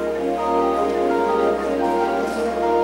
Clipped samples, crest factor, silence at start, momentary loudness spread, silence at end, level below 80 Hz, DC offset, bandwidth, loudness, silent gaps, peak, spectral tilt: under 0.1%; 12 dB; 0 s; 3 LU; 0 s; -46 dBFS; under 0.1%; 16 kHz; -20 LUFS; none; -8 dBFS; -5.5 dB/octave